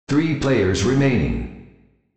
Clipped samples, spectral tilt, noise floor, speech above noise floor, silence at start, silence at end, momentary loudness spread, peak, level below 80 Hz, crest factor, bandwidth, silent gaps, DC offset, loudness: under 0.1%; -6.5 dB/octave; -53 dBFS; 34 dB; 0.1 s; 0.45 s; 9 LU; -6 dBFS; -36 dBFS; 14 dB; 8.6 kHz; none; under 0.1%; -19 LUFS